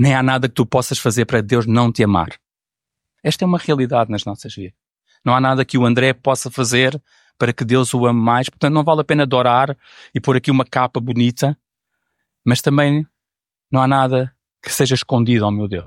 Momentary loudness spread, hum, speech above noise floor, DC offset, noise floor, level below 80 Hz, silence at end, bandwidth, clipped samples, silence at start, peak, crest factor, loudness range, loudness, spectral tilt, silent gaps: 10 LU; none; 72 dB; under 0.1%; -88 dBFS; -52 dBFS; 0 s; 16.5 kHz; under 0.1%; 0 s; -2 dBFS; 16 dB; 3 LU; -17 LUFS; -5.5 dB/octave; none